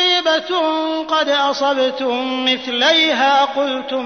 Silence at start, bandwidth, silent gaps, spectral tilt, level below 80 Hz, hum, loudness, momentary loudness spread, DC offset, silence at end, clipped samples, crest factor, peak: 0 s; 6.6 kHz; none; -1.5 dB/octave; -62 dBFS; none; -16 LUFS; 7 LU; 0.1%; 0 s; under 0.1%; 12 dB; -4 dBFS